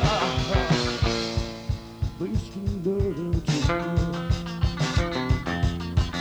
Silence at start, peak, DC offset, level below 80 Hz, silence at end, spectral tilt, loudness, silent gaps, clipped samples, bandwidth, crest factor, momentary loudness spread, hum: 0 s; -8 dBFS; under 0.1%; -32 dBFS; 0 s; -5.5 dB/octave; -26 LUFS; none; under 0.1%; over 20 kHz; 16 dB; 8 LU; none